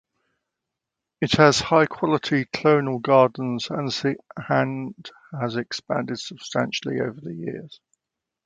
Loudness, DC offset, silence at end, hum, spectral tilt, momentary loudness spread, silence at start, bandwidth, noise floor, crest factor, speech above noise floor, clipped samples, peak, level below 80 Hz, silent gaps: -23 LUFS; under 0.1%; 0.7 s; none; -5 dB/octave; 15 LU; 1.2 s; 9.4 kHz; -85 dBFS; 24 dB; 63 dB; under 0.1%; 0 dBFS; -58 dBFS; none